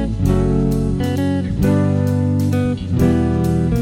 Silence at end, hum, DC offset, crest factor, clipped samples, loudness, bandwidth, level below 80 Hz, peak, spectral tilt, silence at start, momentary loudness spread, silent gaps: 0 s; none; under 0.1%; 12 dB; under 0.1%; -17 LUFS; 16 kHz; -28 dBFS; -4 dBFS; -8.5 dB/octave; 0 s; 4 LU; none